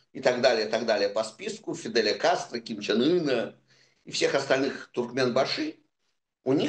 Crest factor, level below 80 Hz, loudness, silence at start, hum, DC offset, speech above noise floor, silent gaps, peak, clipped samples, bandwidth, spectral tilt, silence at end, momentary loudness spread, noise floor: 20 dB; -76 dBFS; -27 LUFS; 0.15 s; none; under 0.1%; 52 dB; none; -8 dBFS; under 0.1%; 9.8 kHz; -4 dB/octave; 0 s; 11 LU; -78 dBFS